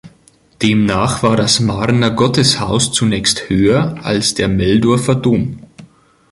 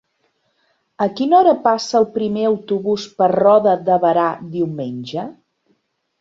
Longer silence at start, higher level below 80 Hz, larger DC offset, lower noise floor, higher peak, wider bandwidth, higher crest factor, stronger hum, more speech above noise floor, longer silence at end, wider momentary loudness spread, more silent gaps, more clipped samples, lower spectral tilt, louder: second, 0.05 s vs 1 s; first, -38 dBFS vs -62 dBFS; neither; second, -50 dBFS vs -66 dBFS; about the same, 0 dBFS vs -2 dBFS; first, 11.5 kHz vs 7.8 kHz; about the same, 14 dB vs 16 dB; neither; second, 36 dB vs 50 dB; second, 0.45 s vs 0.9 s; second, 4 LU vs 13 LU; neither; neither; second, -4.5 dB/octave vs -6 dB/octave; first, -14 LUFS vs -17 LUFS